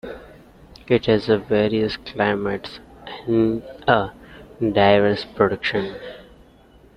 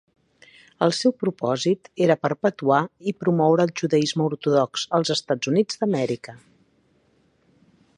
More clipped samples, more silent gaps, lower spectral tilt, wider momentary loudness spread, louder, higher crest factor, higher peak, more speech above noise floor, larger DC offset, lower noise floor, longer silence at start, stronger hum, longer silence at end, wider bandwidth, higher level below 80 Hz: neither; neither; first, -7.5 dB/octave vs -5.5 dB/octave; first, 19 LU vs 5 LU; about the same, -20 LUFS vs -22 LUFS; about the same, 20 dB vs 20 dB; first, 0 dBFS vs -4 dBFS; second, 31 dB vs 41 dB; neither; second, -50 dBFS vs -63 dBFS; second, 0.05 s vs 0.8 s; neither; second, 0.75 s vs 1.6 s; second, 9.6 kHz vs 11 kHz; first, -48 dBFS vs -68 dBFS